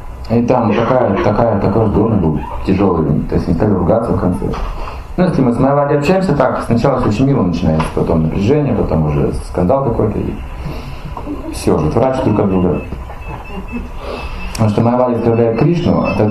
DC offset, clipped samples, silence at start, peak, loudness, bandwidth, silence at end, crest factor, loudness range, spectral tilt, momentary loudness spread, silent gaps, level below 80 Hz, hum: under 0.1%; under 0.1%; 0 s; 0 dBFS; -14 LUFS; 13 kHz; 0 s; 14 dB; 4 LU; -8 dB/octave; 13 LU; none; -28 dBFS; none